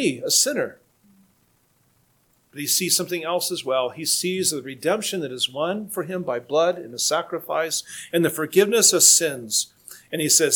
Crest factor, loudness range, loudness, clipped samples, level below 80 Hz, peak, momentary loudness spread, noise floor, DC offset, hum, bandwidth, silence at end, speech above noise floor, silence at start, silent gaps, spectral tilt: 22 dB; 6 LU; -21 LUFS; under 0.1%; -74 dBFS; 0 dBFS; 12 LU; -63 dBFS; under 0.1%; none; 19 kHz; 0 s; 41 dB; 0 s; none; -2 dB/octave